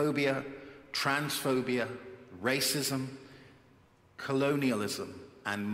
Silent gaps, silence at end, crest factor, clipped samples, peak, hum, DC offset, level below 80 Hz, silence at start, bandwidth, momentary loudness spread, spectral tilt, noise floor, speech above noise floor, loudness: none; 0 s; 18 dB; under 0.1%; -14 dBFS; none; under 0.1%; -72 dBFS; 0 s; 16 kHz; 16 LU; -4 dB/octave; -62 dBFS; 31 dB; -32 LUFS